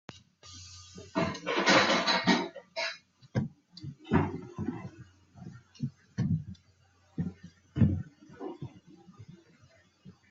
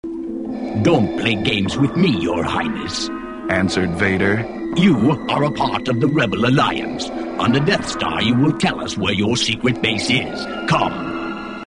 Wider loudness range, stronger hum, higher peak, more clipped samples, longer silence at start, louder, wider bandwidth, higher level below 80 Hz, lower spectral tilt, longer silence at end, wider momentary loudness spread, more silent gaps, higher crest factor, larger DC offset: first, 8 LU vs 2 LU; neither; second, -10 dBFS vs -2 dBFS; neither; about the same, 0.1 s vs 0.05 s; second, -30 LUFS vs -18 LUFS; second, 7.8 kHz vs 10.5 kHz; second, -60 dBFS vs -44 dBFS; about the same, -5 dB/octave vs -5.5 dB/octave; first, 0.2 s vs 0 s; first, 23 LU vs 9 LU; neither; first, 24 dB vs 16 dB; neither